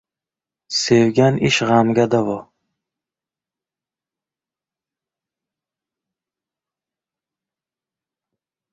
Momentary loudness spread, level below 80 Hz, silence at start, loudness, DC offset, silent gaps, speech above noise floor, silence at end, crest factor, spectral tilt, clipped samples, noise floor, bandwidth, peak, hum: 9 LU; -58 dBFS; 0.7 s; -16 LUFS; under 0.1%; none; 74 dB; 6.3 s; 20 dB; -5 dB/octave; under 0.1%; -90 dBFS; 8 kHz; -2 dBFS; none